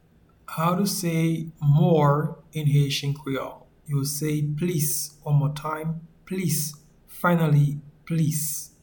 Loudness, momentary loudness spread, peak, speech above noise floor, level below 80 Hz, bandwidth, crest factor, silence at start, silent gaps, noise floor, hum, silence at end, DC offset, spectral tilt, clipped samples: -24 LUFS; 11 LU; -8 dBFS; 26 dB; -56 dBFS; 19.5 kHz; 16 dB; 0.5 s; none; -49 dBFS; none; 0.15 s; under 0.1%; -5.5 dB/octave; under 0.1%